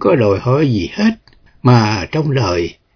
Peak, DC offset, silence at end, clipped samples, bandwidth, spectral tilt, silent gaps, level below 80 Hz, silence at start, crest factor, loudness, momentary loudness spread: 0 dBFS; under 0.1%; 0.25 s; under 0.1%; 5.4 kHz; -7 dB/octave; none; -42 dBFS; 0 s; 14 dB; -15 LUFS; 6 LU